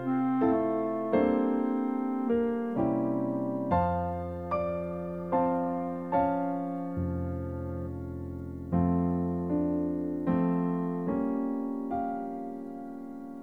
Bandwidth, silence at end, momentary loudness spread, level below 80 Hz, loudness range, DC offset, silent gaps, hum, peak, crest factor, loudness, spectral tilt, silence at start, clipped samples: 4.3 kHz; 0 s; 11 LU; -52 dBFS; 3 LU; 0.1%; none; none; -12 dBFS; 16 dB; -30 LUFS; -10.5 dB/octave; 0 s; under 0.1%